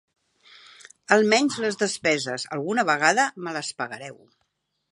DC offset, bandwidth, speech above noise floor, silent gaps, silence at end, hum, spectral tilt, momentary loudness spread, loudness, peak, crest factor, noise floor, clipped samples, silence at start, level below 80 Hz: under 0.1%; 11.5 kHz; 51 dB; none; 0.8 s; none; -3 dB/octave; 14 LU; -23 LUFS; -2 dBFS; 24 dB; -75 dBFS; under 0.1%; 1.1 s; -76 dBFS